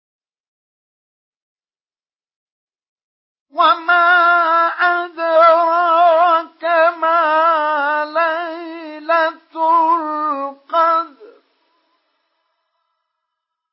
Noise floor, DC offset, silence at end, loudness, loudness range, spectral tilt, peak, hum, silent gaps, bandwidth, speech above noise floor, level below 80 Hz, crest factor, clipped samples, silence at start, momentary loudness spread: under -90 dBFS; under 0.1%; 2.45 s; -14 LUFS; 9 LU; -5 dB/octave; -2 dBFS; none; none; 5.8 kHz; over 76 dB; under -90 dBFS; 16 dB; under 0.1%; 3.55 s; 11 LU